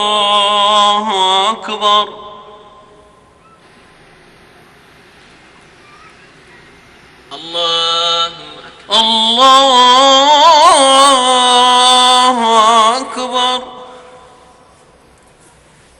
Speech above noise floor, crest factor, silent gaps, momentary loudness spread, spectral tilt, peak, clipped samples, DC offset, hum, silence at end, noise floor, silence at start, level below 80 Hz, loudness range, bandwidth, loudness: 36 dB; 12 dB; none; 12 LU; -0.5 dB/octave; 0 dBFS; under 0.1%; under 0.1%; none; 2 s; -46 dBFS; 0 s; -54 dBFS; 13 LU; 17 kHz; -9 LUFS